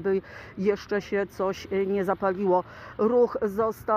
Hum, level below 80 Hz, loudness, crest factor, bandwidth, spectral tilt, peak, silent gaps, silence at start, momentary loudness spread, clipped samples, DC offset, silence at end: none; -56 dBFS; -26 LUFS; 16 dB; 15.5 kHz; -7 dB/octave; -10 dBFS; none; 0 s; 7 LU; under 0.1%; under 0.1%; 0 s